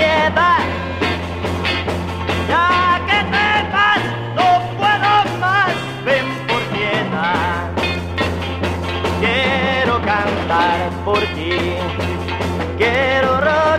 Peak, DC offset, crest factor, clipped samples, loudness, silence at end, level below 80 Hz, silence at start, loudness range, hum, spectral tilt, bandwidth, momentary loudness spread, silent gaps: -2 dBFS; under 0.1%; 14 dB; under 0.1%; -17 LUFS; 0 s; -38 dBFS; 0 s; 3 LU; none; -5.5 dB/octave; 15 kHz; 7 LU; none